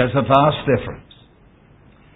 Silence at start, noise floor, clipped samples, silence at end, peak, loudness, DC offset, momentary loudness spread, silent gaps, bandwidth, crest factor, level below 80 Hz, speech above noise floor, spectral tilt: 0 s; -50 dBFS; under 0.1%; 1.15 s; 0 dBFS; -17 LUFS; under 0.1%; 19 LU; none; 4 kHz; 20 dB; -44 dBFS; 33 dB; -9 dB/octave